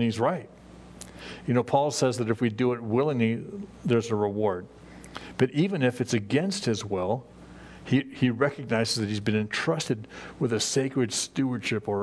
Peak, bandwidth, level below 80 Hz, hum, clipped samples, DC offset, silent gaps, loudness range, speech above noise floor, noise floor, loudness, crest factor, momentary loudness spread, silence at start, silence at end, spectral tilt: -8 dBFS; 11 kHz; -60 dBFS; none; under 0.1%; under 0.1%; none; 2 LU; 20 dB; -46 dBFS; -27 LUFS; 20 dB; 17 LU; 0 s; 0 s; -5 dB/octave